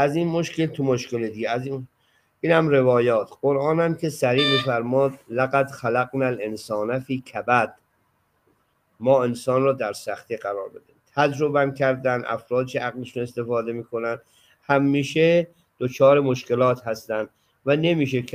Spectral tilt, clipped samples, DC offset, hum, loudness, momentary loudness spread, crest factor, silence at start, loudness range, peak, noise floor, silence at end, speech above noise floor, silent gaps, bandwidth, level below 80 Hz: -6 dB/octave; under 0.1%; under 0.1%; none; -23 LUFS; 11 LU; 18 dB; 0 s; 4 LU; -4 dBFS; -67 dBFS; 0.05 s; 45 dB; none; 15.5 kHz; -66 dBFS